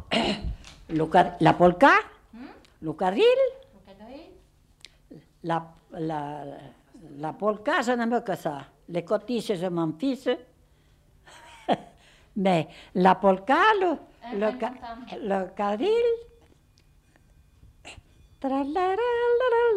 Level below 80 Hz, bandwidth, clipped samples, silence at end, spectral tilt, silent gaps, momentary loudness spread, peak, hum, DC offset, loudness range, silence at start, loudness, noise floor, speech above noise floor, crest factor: -52 dBFS; 12.5 kHz; under 0.1%; 0 s; -6 dB/octave; none; 20 LU; -4 dBFS; none; under 0.1%; 9 LU; 0 s; -25 LUFS; -60 dBFS; 36 dB; 22 dB